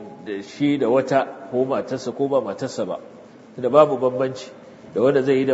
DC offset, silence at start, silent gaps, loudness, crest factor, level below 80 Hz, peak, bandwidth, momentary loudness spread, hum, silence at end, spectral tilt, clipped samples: under 0.1%; 0 s; none; -21 LUFS; 20 dB; -68 dBFS; -2 dBFS; 8 kHz; 15 LU; none; 0 s; -6.5 dB/octave; under 0.1%